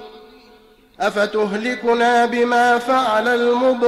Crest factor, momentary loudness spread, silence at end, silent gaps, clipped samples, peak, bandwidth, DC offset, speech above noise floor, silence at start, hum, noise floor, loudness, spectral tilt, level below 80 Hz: 12 dB; 6 LU; 0 s; none; under 0.1%; -6 dBFS; 13.5 kHz; under 0.1%; 33 dB; 0 s; none; -49 dBFS; -17 LUFS; -4 dB/octave; -58 dBFS